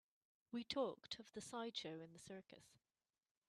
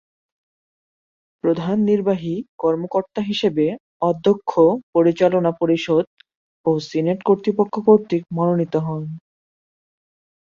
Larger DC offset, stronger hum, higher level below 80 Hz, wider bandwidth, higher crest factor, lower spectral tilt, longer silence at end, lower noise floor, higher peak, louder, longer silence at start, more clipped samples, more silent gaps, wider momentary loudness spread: neither; neither; second, -86 dBFS vs -60 dBFS; first, 13 kHz vs 7.4 kHz; first, 24 dB vs 18 dB; second, -4 dB/octave vs -7.5 dB/octave; second, 0.8 s vs 1.25 s; about the same, under -90 dBFS vs under -90 dBFS; second, -28 dBFS vs -2 dBFS; second, -50 LUFS vs -19 LUFS; second, 0.5 s vs 1.45 s; neither; second, none vs 2.48-2.58 s, 3.80-4.00 s, 4.83-4.93 s, 6.07-6.17 s, 6.35-6.64 s; first, 14 LU vs 8 LU